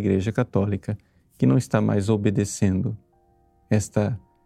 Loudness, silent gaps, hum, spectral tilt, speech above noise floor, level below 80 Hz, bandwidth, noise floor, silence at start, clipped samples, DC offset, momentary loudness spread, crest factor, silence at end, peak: -23 LUFS; none; none; -7 dB/octave; 39 dB; -54 dBFS; 13.5 kHz; -61 dBFS; 0 s; under 0.1%; under 0.1%; 9 LU; 18 dB; 0.25 s; -6 dBFS